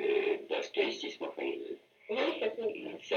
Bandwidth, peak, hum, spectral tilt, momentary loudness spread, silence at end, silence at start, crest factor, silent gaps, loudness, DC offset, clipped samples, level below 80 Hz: 7 kHz; -18 dBFS; none; -3.5 dB/octave; 10 LU; 0 s; 0 s; 16 dB; none; -35 LUFS; under 0.1%; under 0.1%; -84 dBFS